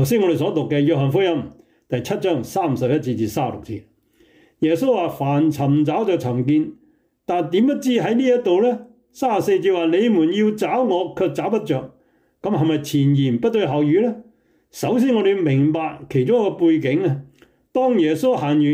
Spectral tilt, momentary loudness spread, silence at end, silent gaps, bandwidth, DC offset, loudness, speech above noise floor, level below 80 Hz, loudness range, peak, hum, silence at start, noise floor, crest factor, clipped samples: -7 dB/octave; 8 LU; 0 s; none; 16 kHz; under 0.1%; -19 LUFS; 37 dB; -60 dBFS; 3 LU; -8 dBFS; none; 0 s; -56 dBFS; 12 dB; under 0.1%